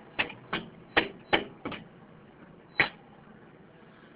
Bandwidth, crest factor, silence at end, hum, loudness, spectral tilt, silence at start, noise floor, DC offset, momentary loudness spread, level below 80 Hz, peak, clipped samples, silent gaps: 4 kHz; 28 dB; 0.1 s; none; -30 LUFS; -1 dB/octave; 0 s; -54 dBFS; under 0.1%; 14 LU; -60 dBFS; -8 dBFS; under 0.1%; none